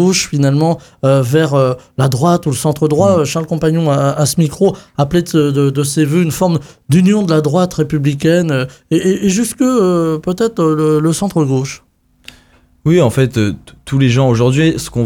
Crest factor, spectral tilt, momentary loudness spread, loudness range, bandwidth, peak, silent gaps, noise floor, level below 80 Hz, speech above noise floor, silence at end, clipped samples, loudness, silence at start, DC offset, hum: 12 dB; -6 dB/octave; 5 LU; 2 LU; 17.5 kHz; 0 dBFS; none; -49 dBFS; -42 dBFS; 36 dB; 0 s; under 0.1%; -13 LUFS; 0 s; under 0.1%; none